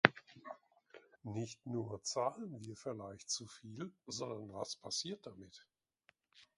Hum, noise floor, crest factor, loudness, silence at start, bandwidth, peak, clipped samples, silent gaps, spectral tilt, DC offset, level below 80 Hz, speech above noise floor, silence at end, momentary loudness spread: none; -75 dBFS; 40 dB; -42 LUFS; 0.05 s; 11 kHz; -2 dBFS; under 0.1%; none; -3.5 dB/octave; under 0.1%; -76 dBFS; 31 dB; 0.15 s; 18 LU